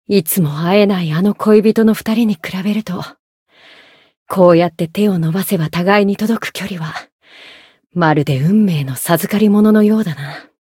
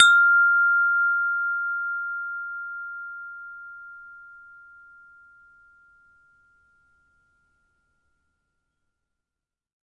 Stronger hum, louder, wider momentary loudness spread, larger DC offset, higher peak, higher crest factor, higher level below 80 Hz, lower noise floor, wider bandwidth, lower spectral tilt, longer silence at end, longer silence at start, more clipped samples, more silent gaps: neither; first, -14 LUFS vs -21 LUFS; second, 13 LU vs 25 LU; neither; about the same, 0 dBFS vs -2 dBFS; second, 14 dB vs 24 dB; first, -56 dBFS vs -76 dBFS; second, -45 dBFS vs -89 dBFS; first, 17 kHz vs 10.5 kHz; first, -6.5 dB/octave vs 5 dB/octave; second, 0.3 s vs 5.65 s; about the same, 0.1 s vs 0 s; neither; first, 3.19-3.46 s, 4.17-4.26 s, 7.12-7.19 s vs none